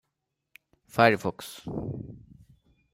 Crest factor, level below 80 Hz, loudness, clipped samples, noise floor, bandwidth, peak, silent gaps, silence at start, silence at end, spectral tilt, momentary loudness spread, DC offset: 24 dB; -58 dBFS; -27 LUFS; under 0.1%; -82 dBFS; 16 kHz; -6 dBFS; none; 0.95 s; 0.75 s; -5.5 dB/octave; 18 LU; under 0.1%